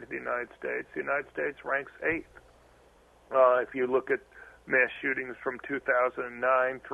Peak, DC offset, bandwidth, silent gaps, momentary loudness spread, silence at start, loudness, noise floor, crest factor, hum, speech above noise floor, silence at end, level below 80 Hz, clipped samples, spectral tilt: -10 dBFS; under 0.1%; 7 kHz; none; 10 LU; 0 s; -29 LUFS; -60 dBFS; 20 dB; none; 30 dB; 0 s; -64 dBFS; under 0.1%; -6.5 dB/octave